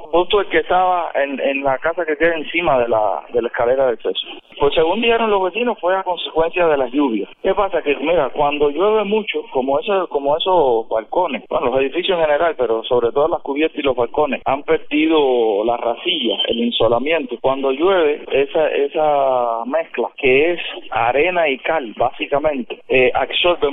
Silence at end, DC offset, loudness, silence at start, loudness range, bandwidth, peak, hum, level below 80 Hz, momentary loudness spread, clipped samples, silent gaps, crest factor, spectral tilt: 0 s; under 0.1%; -17 LUFS; 0 s; 1 LU; 4 kHz; -2 dBFS; none; -44 dBFS; 5 LU; under 0.1%; none; 14 dB; -8.5 dB/octave